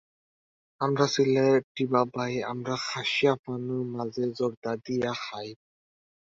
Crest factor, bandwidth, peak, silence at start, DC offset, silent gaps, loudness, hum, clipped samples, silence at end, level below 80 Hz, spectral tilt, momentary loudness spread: 20 dB; 7.8 kHz; -8 dBFS; 0.8 s; under 0.1%; 1.64-1.75 s, 3.39-3.44 s, 4.57-4.62 s; -28 LUFS; none; under 0.1%; 0.8 s; -68 dBFS; -5.5 dB/octave; 10 LU